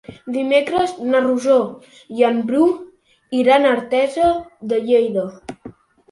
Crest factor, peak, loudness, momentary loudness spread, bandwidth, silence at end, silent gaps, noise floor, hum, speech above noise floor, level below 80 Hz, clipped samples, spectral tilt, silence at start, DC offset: 16 dB; -2 dBFS; -18 LUFS; 13 LU; 11.5 kHz; 0.4 s; none; -41 dBFS; none; 24 dB; -54 dBFS; under 0.1%; -5 dB/octave; 0.1 s; under 0.1%